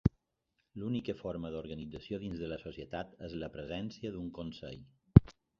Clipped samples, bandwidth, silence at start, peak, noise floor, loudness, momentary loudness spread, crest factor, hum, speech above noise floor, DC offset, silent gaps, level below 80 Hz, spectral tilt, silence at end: under 0.1%; 6.8 kHz; 0.05 s; -2 dBFS; -82 dBFS; -35 LUFS; 19 LU; 32 dB; none; 41 dB; under 0.1%; none; -46 dBFS; -8 dB/octave; 0.3 s